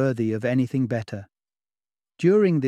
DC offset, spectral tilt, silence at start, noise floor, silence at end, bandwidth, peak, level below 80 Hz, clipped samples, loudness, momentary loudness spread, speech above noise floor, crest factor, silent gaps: under 0.1%; -8.5 dB/octave; 0 s; under -90 dBFS; 0 s; 10.5 kHz; -8 dBFS; -66 dBFS; under 0.1%; -23 LUFS; 14 LU; over 68 dB; 16 dB; none